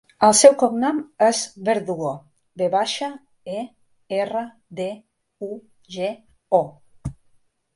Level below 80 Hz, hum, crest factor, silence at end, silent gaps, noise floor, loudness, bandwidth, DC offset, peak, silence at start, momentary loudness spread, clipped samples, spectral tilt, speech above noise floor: -54 dBFS; none; 22 dB; 0.65 s; none; -60 dBFS; -21 LUFS; 11.5 kHz; under 0.1%; 0 dBFS; 0.2 s; 22 LU; under 0.1%; -3.5 dB/octave; 40 dB